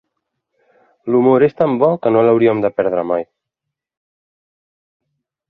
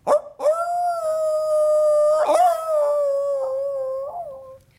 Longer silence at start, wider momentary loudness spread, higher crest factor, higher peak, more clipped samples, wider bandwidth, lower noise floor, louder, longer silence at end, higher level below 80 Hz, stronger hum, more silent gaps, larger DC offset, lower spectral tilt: first, 1.05 s vs 0.05 s; about the same, 10 LU vs 12 LU; about the same, 16 dB vs 14 dB; first, -2 dBFS vs -6 dBFS; neither; second, 5.2 kHz vs 15.5 kHz; first, -82 dBFS vs -40 dBFS; first, -15 LUFS vs -20 LUFS; first, 2.25 s vs 0.2 s; first, -60 dBFS vs -66 dBFS; neither; neither; neither; first, -10.5 dB/octave vs -3 dB/octave